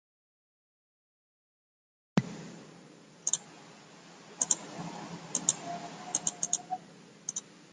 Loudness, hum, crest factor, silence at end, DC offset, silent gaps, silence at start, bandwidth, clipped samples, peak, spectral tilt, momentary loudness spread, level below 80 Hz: -34 LUFS; none; 32 dB; 0 s; under 0.1%; none; 2.15 s; 11.5 kHz; under 0.1%; -8 dBFS; -2.5 dB/octave; 23 LU; -76 dBFS